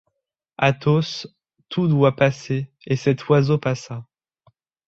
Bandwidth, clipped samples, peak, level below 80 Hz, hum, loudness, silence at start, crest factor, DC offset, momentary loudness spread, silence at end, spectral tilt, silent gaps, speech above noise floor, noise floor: 7.6 kHz; under 0.1%; -2 dBFS; -58 dBFS; none; -21 LUFS; 0.6 s; 20 dB; under 0.1%; 13 LU; 0.85 s; -7 dB/octave; none; 59 dB; -79 dBFS